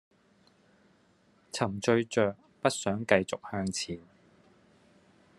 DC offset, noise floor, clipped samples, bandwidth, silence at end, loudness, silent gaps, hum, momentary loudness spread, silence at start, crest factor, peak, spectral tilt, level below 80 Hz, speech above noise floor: under 0.1%; -66 dBFS; under 0.1%; 12.5 kHz; 1.4 s; -30 LUFS; none; none; 10 LU; 1.55 s; 28 dB; -6 dBFS; -4.5 dB/octave; -72 dBFS; 36 dB